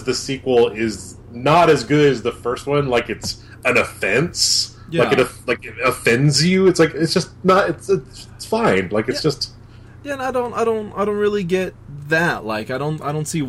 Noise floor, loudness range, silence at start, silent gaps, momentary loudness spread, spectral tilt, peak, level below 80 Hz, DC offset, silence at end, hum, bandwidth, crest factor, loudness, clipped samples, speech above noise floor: -41 dBFS; 5 LU; 0 s; none; 11 LU; -4.5 dB/octave; -4 dBFS; -46 dBFS; under 0.1%; 0 s; none; 16 kHz; 16 dB; -18 LUFS; under 0.1%; 22 dB